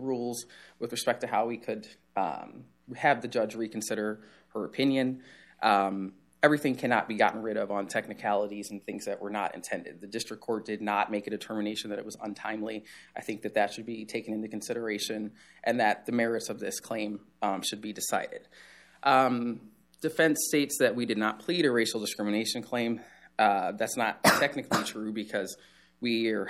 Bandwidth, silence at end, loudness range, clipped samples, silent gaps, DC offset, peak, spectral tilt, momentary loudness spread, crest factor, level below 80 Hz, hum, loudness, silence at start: 15.5 kHz; 0 s; 6 LU; under 0.1%; none; under 0.1%; -6 dBFS; -3.5 dB/octave; 13 LU; 24 dB; -74 dBFS; none; -30 LUFS; 0 s